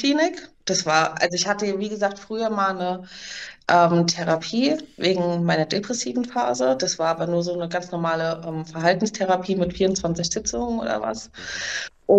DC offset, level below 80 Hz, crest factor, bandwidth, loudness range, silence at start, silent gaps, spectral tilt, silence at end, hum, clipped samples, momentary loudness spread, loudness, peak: under 0.1%; -52 dBFS; 18 dB; 8.6 kHz; 2 LU; 0 s; none; -4 dB/octave; 0 s; none; under 0.1%; 9 LU; -23 LUFS; -4 dBFS